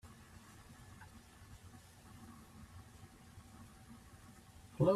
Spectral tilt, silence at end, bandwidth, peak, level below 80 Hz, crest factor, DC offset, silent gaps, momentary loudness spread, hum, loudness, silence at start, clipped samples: -7.5 dB/octave; 0 s; 14.5 kHz; -20 dBFS; -66 dBFS; 24 dB; under 0.1%; none; 2 LU; none; -51 LUFS; 0.05 s; under 0.1%